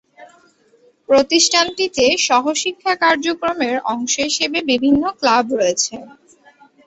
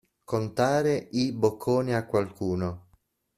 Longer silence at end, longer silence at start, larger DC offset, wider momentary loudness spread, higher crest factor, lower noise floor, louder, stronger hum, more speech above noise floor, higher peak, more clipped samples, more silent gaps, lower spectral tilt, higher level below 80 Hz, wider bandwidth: first, 0.75 s vs 0.55 s; about the same, 0.2 s vs 0.3 s; neither; about the same, 7 LU vs 7 LU; about the same, 18 dB vs 18 dB; second, -54 dBFS vs -67 dBFS; first, -16 LUFS vs -27 LUFS; neither; about the same, 38 dB vs 40 dB; first, 0 dBFS vs -8 dBFS; neither; neither; second, -1.5 dB/octave vs -6.5 dB/octave; first, -54 dBFS vs -60 dBFS; second, 8.2 kHz vs 14.5 kHz